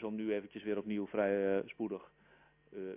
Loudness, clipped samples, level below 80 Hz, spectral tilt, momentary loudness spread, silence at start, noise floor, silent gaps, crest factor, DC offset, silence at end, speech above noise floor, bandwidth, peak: -37 LUFS; under 0.1%; -74 dBFS; -5.5 dB/octave; 13 LU; 0 s; -64 dBFS; none; 18 dB; under 0.1%; 0 s; 28 dB; 3.7 kHz; -20 dBFS